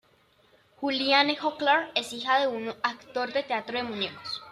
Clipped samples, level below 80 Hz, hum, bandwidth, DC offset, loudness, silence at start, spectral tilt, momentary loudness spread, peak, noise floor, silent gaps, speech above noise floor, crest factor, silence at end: under 0.1%; -74 dBFS; none; 13.5 kHz; under 0.1%; -27 LUFS; 0.8 s; -3 dB/octave; 10 LU; -8 dBFS; -63 dBFS; none; 36 dB; 22 dB; 0 s